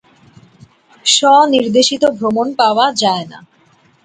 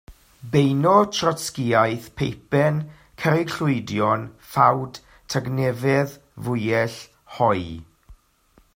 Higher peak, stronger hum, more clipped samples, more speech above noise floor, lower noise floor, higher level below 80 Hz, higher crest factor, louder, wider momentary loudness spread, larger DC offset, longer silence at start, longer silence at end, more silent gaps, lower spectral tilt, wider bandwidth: about the same, 0 dBFS vs -2 dBFS; neither; neither; about the same, 39 dB vs 38 dB; second, -52 dBFS vs -59 dBFS; second, -60 dBFS vs -54 dBFS; second, 14 dB vs 20 dB; first, -12 LUFS vs -22 LUFS; second, 9 LU vs 14 LU; neither; first, 1.05 s vs 0.1 s; about the same, 0.65 s vs 0.6 s; neither; second, -2.5 dB/octave vs -6 dB/octave; second, 9.6 kHz vs 16.5 kHz